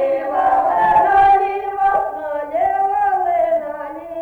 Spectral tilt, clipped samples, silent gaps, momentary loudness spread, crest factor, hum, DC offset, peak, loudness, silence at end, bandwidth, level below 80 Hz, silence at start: -6 dB/octave; under 0.1%; none; 11 LU; 12 dB; none; under 0.1%; -4 dBFS; -16 LUFS; 0 s; 4.6 kHz; -48 dBFS; 0 s